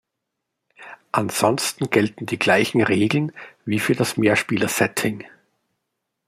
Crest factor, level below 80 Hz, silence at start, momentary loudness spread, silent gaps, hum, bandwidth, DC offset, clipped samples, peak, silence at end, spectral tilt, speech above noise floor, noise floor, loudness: 20 dB; -62 dBFS; 0.8 s; 8 LU; none; none; 16 kHz; under 0.1%; under 0.1%; -2 dBFS; 1 s; -4.5 dB/octave; 60 dB; -80 dBFS; -20 LUFS